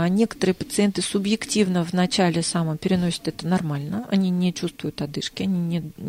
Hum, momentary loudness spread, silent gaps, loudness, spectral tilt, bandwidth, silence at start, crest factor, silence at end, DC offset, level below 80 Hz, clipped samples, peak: none; 7 LU; none; -23 LUFS; -5.5 dB/octave; 15.5 kHz; 0 s; 16 dB; 0 s; under 0.1%; -54 dBFS; under 0.1%; -8 dBFS